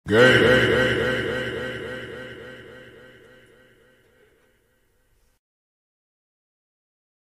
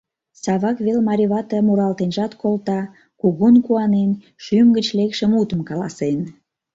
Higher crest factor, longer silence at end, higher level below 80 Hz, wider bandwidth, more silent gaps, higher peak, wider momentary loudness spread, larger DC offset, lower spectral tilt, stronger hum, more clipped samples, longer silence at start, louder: first, 22 dB vs 14 dB; first, 4.6 s vs 0.45 s; first, -48 dBFS vs -58 dBFS; first, 15 kHz vs 7.8 kHz; neither; about the same, -2 dBFS vs -4 dBFS; first, 25 LU vs 11 LU; neither; second, -5 dB/octave vs -7 dB/octave; neither; neither; second, 0.05 s vs 0.45 s; about the same, -19 LUFS vs -18 LUFS